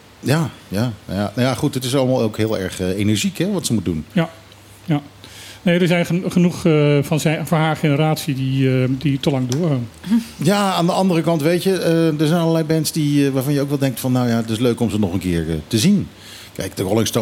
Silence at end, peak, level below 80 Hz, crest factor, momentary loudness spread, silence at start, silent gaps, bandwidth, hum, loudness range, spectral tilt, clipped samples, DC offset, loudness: 0 s; -4 dBFS; -48 dBFS; 14 dB; 7 LU; 0.2 s; none; 17 kHz; none; 3 LU; -6 dB/octave; under 0.1%; under 0.1%; -18 LUFS